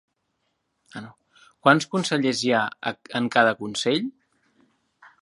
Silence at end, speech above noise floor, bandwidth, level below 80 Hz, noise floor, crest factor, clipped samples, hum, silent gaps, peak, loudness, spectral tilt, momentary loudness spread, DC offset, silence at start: 1.1 s; 52 dB; 11.5 kHz; -72 dBFS; -75 dBFS; 24 dB; under 0.1%; none; none; -2 dBFS; -23 LUFS; -4.5 dB/octave; 20 LU; under 0.1%; 0.95 s